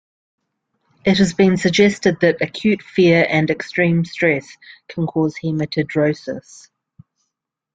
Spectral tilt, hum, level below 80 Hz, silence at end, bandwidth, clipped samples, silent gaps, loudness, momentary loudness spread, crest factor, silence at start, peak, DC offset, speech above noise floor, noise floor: -6 dB/octave; none; -54 dBFS; 1.35 s; 9.2 kHz; under 0.1%; none; -17 LUFS; 9 LU; 18 dB; 1.05 s; -2 dBFS; under 0.1%; 62 dB; -79 dBFS